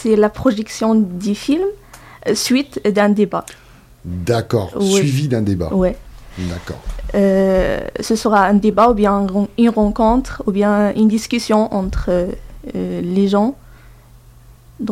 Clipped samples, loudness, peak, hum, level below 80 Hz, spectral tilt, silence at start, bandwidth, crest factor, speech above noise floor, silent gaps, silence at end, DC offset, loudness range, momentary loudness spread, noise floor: under 0.1%; -16 LUFS; 0 dBFS; none; -34 dBFS; -6 dB/octave; 0 s; 15 kHz; 16 dB; 28 dB; none; 0 s; under 0.1%; 4 LU; 13 LU; -43 dBFS